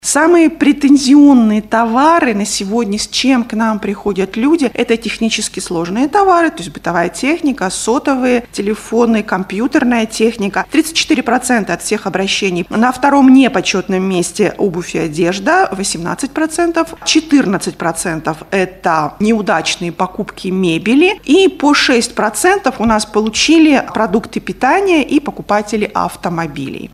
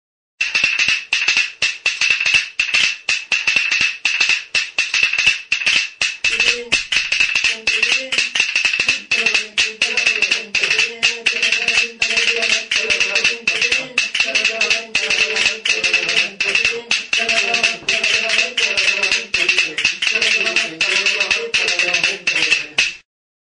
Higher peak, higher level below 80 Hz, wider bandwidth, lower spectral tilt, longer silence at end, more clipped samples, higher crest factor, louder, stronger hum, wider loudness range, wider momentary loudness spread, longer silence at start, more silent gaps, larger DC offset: about the same, 0 dBFS vs 0 dBFS; first, -44 dBFS vs -54 dBFS; first, 14.5 kHz vs 10.5 kHz; first, -4 dB/octave vs 1 dB/octave; second, 0.05 s vs 0.45 s; neither; second, 12 dB vs 18 dB; about the same, -13 LUFS vs -15 LUFS; neither; first, 4 LU vs 0 LU; first, 9 LU vs 3 LU; second, 0.05 s vs 0.4 s; neither; neither